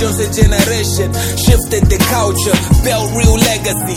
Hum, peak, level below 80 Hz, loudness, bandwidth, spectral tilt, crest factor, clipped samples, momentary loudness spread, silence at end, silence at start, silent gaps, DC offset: none; 0 dBFS; -18 dBFS; -12 LUFS; 17 kHz; -4.5 dB/octave; 12 dB; under 0.1%; 4 LU; 0 s; 0 s; none; under 0.1%